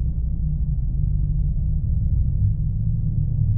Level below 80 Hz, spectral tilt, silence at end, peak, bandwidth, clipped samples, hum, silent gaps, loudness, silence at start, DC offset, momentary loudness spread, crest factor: -22 dBFS; -17 dB/octave; 0 s; -8 dBFS; 0.9 kHz; under 0.1%; none; none; -24 LUFS; 0 s; 1%; 3 LU; 12 dB